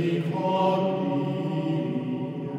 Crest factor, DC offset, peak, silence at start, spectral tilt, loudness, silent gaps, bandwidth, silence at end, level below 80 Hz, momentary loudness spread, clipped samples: 14 dB; under 0.1%; -12 dBFS; 0 s; -8.5 dB/octave; -26 LUFS; none; 8.2 kHz; 0 s; -72 dBFS; 6 LU; under 0.1%